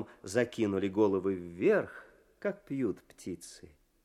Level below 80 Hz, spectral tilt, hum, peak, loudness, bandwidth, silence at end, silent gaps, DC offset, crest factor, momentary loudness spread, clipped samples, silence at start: -70 dBFS; -6 dB/octave; none; -14 dBFS; -32 LUFS; 14 kHz; 0.45 s; none; under 0.1%; 18 dB; 15 LU; under 0.1%; 0 s